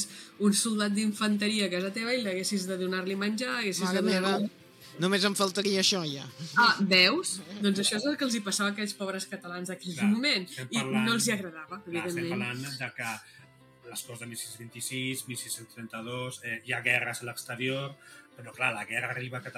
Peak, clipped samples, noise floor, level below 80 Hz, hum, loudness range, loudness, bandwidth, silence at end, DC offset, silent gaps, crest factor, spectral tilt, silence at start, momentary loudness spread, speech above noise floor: -8 dBFS; under 0.1%; -53 dBFS; -82 dBFS; none; 11 LU; -29 LUFS; 16 kHz; 0 s; under 0.1%; none; 24 dB; -3.5 dB/octave; 0 s; 13 LU; 23 dB